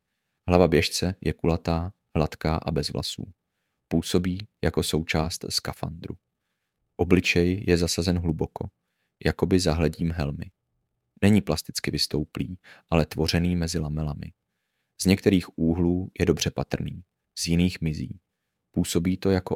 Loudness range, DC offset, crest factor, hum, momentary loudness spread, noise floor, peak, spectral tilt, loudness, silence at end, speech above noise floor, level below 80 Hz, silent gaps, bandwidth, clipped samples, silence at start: 3 LU; under 0.1%; 24 dB; none; 16 LU; -80 dBFS; -2 dBFS; -5.5 dB/octave; -25 LUFS; 0 s; 55 dB; -42 dBFS; none; 16.5 kHz; under 0.1%; 0.45 s